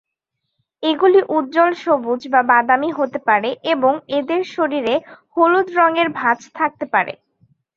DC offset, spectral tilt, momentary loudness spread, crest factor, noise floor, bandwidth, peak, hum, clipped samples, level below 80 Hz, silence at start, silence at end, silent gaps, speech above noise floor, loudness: under 0.1%; -5 dB/octave; 8 LU; 16 dB; -77 dBFS; 7.2 kHz; -2 dBFS; none; under 0.1%; -66 dBFS; 0.8 s; 0.65 s; none; 60 dB; -17 LUFS